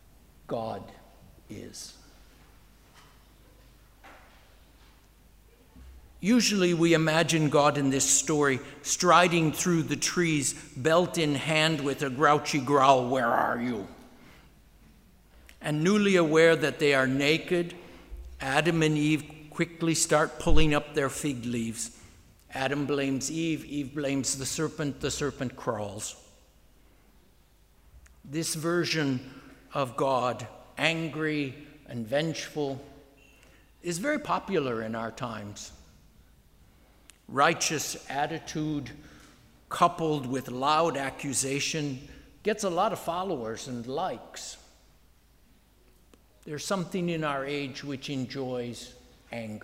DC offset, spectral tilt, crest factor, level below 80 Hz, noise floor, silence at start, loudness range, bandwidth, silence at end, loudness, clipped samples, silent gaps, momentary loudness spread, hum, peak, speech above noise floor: under 0.1%; -4 dB/octave; 24 dB; -46 dBFS; -60 dBFS; 0.5 s; 11 LU; 16 kHz; 0.05 s; -27 LUFS; under 0.1%; none; 17 LU; none; -4 dBFS; 33 dB